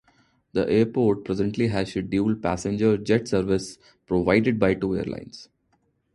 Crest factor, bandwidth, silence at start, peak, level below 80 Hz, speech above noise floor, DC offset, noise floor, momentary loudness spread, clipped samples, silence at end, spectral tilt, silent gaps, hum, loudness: 20 dB; 11.5 kHz; 0.55 s; -4 dBFS; -48 dBFS; 46 dB; under 0.1%; -69 dBFS; 10 LU; under 0.1%; 0.7 s; -6.5 dB/octave; none; none; -24 LUFS